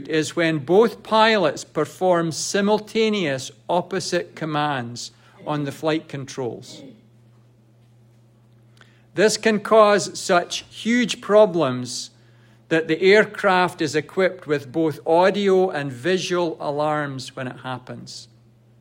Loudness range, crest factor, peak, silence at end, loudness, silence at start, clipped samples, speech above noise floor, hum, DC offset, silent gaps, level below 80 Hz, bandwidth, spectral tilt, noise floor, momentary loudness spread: 10 LU; 20 dB; -2 dBFS; 0.55 s; -21 LUFS; 0 s; under 0.1%; 33 dB; none; under 0.1%; none; -68 dBFS; 16 kHz; -4.5 dB/octave; -54 dBFS; 16 LU